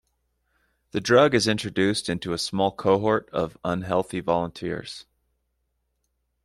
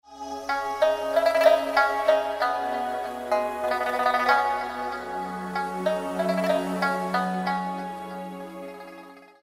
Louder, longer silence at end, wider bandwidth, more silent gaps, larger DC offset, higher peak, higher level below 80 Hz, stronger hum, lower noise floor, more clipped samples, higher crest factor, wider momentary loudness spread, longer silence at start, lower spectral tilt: about the same, -24 LUFS vs -25 LUFS; first, 1.4 s vs 0.2 s; second, 13 kHz vs 16 kHz; neither; neither; about the same, -6 dBFS vs -6 dBFS; about the same, -56 dBFS vs -60 dBFS; neither; first, -75 dBFS vs -46 dBFS; neither; about the same, 20 dB vs 20 dB; about the same, 13 LU vs 15 LU; first, 0.95 s vs 0.1 s; about the same, -5 dB/octave vs -5 dB/octave